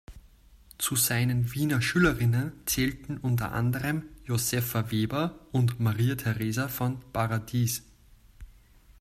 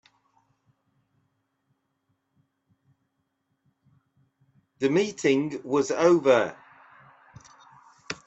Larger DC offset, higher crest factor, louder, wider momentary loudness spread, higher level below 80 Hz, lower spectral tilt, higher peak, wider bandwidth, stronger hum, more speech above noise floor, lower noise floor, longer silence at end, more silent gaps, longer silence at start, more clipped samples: neither; about the same, 18 dB vs 22 dB; second, -28 LUFS vs -24 LUFS; about the same, 7 LU vs 9 LU; first, -50 dBFS vs -72 dBFS; about the same, -5 dB/octave vs -5 dB/octave; second, -10 dBFS vs -6 dBFS; first, 15.5 kHz vs 8.2 kHz; neither; second, 29 dB vs 54 dB; second, -56 dBFS vs -76 dBFS; first, 0.5 s vs 0.15 s; neither; second, 0.1 s vs 4.8 s; neither